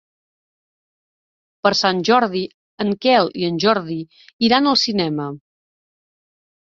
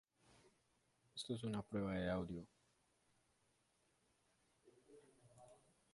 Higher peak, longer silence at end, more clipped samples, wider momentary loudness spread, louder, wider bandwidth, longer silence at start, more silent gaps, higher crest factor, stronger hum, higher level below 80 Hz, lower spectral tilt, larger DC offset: first, -2 dBFS vs -30 dBFS; first, 1.4 s vs 0.4 s; neither; second, 14 LU vs 24 LU; first, -18 LUFS vs -46 LUFS; second, 7.8 kHz vs 11.5 kHz; first, 1.65 s vs 1.15 s; first, 2.54-2.78 s, 4.33-4.39 s vs none; about the same, 18 dB vs 20 dB; neither; first, -62 dBFS vs -70 dBFS; second, -4.5 dB/octave vs -6 dB/octave; neither